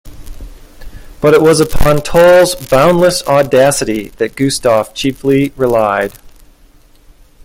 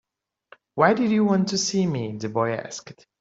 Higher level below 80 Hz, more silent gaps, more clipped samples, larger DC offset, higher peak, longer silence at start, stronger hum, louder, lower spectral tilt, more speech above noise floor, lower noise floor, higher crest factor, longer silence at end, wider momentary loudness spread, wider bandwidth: first, -30 dBFS vs -64 dBFS; neither; first, 0.1% vs under 0.1%; neither; first, 0 dBFS vs -4 dBFS; second, 0.05 s vs 0.75 s; neither; first, -11 LUFS vs -23 LUFS; about the same, -5 dB/octave vs -5 dB/octave; about the same, 34 dB vs 33 dB; second, -44 dBFS vs -56 dBFS; second, 12 dB vs 20 dB; first, 1.15 s vs 0.3 s; second, 10 LU vs 15 LU; first, 17 kHz vs 8 kHz